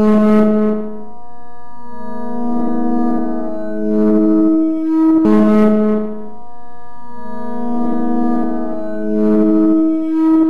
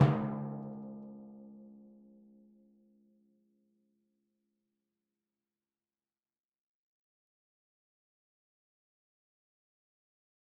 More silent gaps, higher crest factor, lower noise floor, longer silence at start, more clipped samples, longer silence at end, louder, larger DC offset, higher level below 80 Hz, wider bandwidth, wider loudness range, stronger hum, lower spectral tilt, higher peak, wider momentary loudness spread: neither; second, 12 dB vs 30 dB; second, -38 dBFS vs under -90 dBFS; about the same, 0 s vs 0 s; neither; second, 0 s vs 8.65 s; first, -15 LUFS vs -37 LUFS; first, 10% vs under 0.1%; first, -46 dBFS vs -76 dBFS; first, 5 kHz vs 3.3 kHz; second, 7 LU vs 23 LU; neither; first, -9.5 dB/octave vs -8 dB/octave; first, -4 dBFS vs -12 dBFS; second, 18 LU vs 24 LU